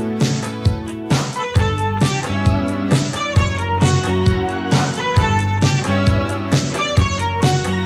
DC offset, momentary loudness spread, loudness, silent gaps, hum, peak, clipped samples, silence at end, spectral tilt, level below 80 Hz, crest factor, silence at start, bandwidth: under 0.1%; 4 LU; -18 LUFS; none; none; -2 dBFS; under 0.1%; 0 s; -5.5 dB/octave; -30 dBFS; 14 dB; 0 s; 13.5 kHz